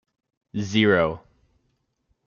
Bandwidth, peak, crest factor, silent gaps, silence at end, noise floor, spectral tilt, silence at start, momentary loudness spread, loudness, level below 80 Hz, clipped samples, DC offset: 7.2 kHz; -6 dBFS; 20 dB; none; 1.1 s; -72 dBFS; -6 dB/octave; 0.55 s; 16 LU; -22 LUFS; -58 dBFS; under 0.1%; under 0.1%